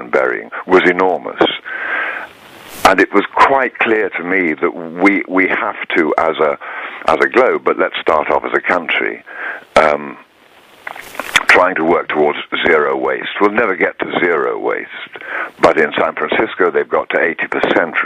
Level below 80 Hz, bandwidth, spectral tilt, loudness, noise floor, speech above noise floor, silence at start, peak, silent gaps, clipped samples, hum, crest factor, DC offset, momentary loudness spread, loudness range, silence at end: -50 dBFS; 15.5 kHz; -4 dB/octave; -14 LUFS; -46 dBFS; 32 dB; 0 s; 0 dBFS; none; under 0.1%; none; 14 dB; under 0.1%; 12 LU; 2 LU; 0 s